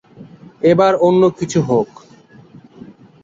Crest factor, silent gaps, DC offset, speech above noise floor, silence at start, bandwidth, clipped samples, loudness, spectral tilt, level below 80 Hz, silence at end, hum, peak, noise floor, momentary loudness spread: 16 dB; none; under 0.1%; 31 dB; 0.2 s; 7.8 kHz; under 0.1%; -14 LUFS; -6.5 dB/octave; -54 dBFS; 1.4 s; none; -2 dBFS; -44 dBFS; 7 LU